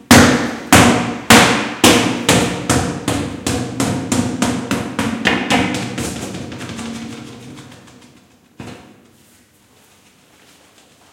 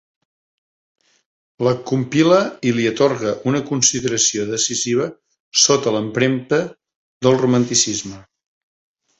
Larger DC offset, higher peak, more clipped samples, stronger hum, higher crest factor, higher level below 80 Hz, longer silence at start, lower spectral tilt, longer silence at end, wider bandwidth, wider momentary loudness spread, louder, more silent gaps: neither; about the same, 0 dBFS vs 0 dBFS; first, 0.2% vs under 0.1%; neither; about the same, 16 dB vs 18 dB; first, -42 dBFS vs -56 dBFS; second, 0.1 s vs 1.6 s; about the same, -3.5 dB/octave vs -3.5 dB/octave; first, 2.3 s vs 1 s; first, 17 kHz vs 8.4 kHz; first, 23 LU vs 7 LU; first, -14 LUFS vs -17 LUFS; second, none vs 5.40-5.51 s, 6.96-7.21 s